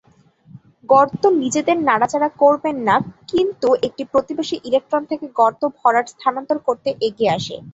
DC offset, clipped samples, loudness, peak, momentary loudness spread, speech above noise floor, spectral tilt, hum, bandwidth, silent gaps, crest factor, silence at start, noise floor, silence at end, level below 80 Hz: under 0.1%; under 0.1%; -18 LUFS; -2 dBFS; 7 LU; 33 dB; -4.5 dB/octave; none; 8 kHz; none; 16 dB; 0.55 s; -51 dBFS; 0.05 s; -58 dBFS